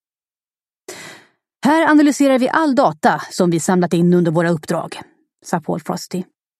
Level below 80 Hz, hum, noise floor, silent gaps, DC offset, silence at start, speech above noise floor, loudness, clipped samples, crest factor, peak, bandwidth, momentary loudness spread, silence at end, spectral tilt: -66 dBFS; none; under -90 dBFS; none; under 0.1%; 0.9 s; over 75 dB; -16 LUFS; under 0.1%; 16 dB; 0 dBFS; 14 kHz; 21 LU; 0.35 s; -6 dB/octave